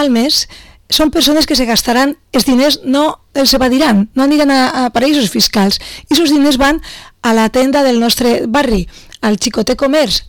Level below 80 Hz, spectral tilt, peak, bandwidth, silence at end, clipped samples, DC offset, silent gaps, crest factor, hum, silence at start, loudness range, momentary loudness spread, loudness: -32 dBFS; -3.5 dB/octave; -4 dBFS; 19 kHz; 0 s; under 0.1%; 0.7%; none; 8 dB; none; 0 s; 1 LU; 6 LU; -11 LUFS